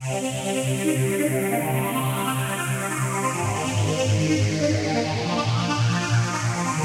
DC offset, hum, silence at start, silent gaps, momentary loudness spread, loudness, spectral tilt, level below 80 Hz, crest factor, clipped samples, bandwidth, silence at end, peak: under 0.1%; none; 0 s; none; 3 LU; -23 LUFS; -5 dB/octave; -54 dBFS; 14 dB; under 0.1%; 16 kHz; 0 s; -10 dBFS